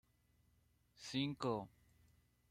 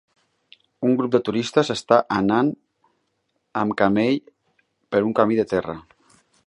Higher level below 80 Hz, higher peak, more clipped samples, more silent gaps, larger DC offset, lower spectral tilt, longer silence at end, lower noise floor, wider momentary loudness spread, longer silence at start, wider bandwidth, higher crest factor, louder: second, -76 dBFS vs -58 dBFS; second, -26 dBFS vs -2 dBFS; neither; neither; neither; about the same, -5.5 dB/octave vs -6 dB/octave; about the same, 0.8 s vs 0.7 s; first, -76 dBFS vs -72 dBFS; first, 15 LU vs 8 LU; first, 1 s vs 0.8 s; first, 15 kHz vs 11 kHz; about the same, 22 dB vs 22 dB; second, -43 LUFS vs -21 LUFS